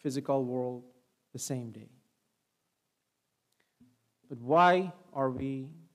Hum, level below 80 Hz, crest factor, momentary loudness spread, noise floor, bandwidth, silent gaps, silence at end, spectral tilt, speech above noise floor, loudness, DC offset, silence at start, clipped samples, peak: none; -72 dBFS; 22 dB; 22 LU; -82 dBFS; 15 kHz; none; 0.15 s; -5.5 dB/octave; 51 dB; -30 LUFS; under 0.1%; 0.05 s; under 0.1%; -12 dBFS